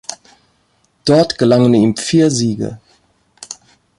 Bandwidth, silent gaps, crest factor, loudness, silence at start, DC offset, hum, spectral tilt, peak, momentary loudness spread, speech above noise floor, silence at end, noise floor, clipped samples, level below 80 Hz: 11.5 kHz; none; 14 dB; -13 LUFS; 0.1 s; under 0.1%; none; -5.5 dB/octave; -2 dBFS; 21 LU; 47 dB; 0.45 s; -59 dBFS; under 0.1%; -52 dBFS